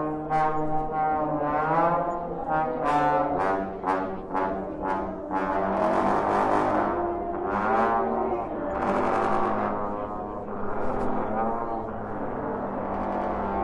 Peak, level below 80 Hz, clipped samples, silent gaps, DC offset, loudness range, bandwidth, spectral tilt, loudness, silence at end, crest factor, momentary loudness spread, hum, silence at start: -10 dBFS; -46 dBFS; under 0.1%; none; under 0.1%; 5 LU; 11 kHz; -7.5 dB/octave; -27 LUFS; 0 s; 16 dB; 8 LU; none; 0 s